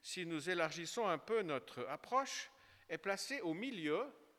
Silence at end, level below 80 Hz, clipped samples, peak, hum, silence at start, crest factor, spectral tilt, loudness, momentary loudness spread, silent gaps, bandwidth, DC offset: 0.15 s; -86 dBFS; under 0.1%; -22 dBFS; none; 0.05 s; 20 dB; -3.5 dB/octave; -41 LUFS; 8 LU; none; 17.5 kHz; under 0.1%